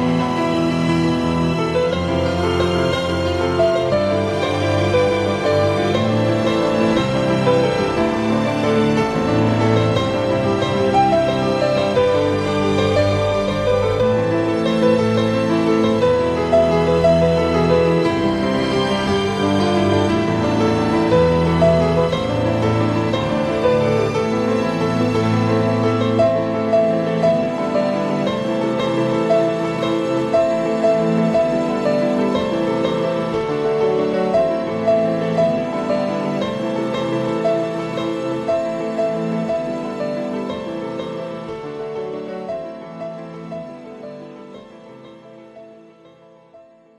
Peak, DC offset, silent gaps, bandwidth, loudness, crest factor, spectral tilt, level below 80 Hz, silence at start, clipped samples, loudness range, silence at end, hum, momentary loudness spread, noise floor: -2 dBFS; under 0.1%; none; 12.5 kHz; -18 LUFS; 14 dB; -6.5 dB/octave; -42 dBFS; 0 s; under 0.1%; 8 LU; 0.4 s; none; 8 LU; -47 dBFS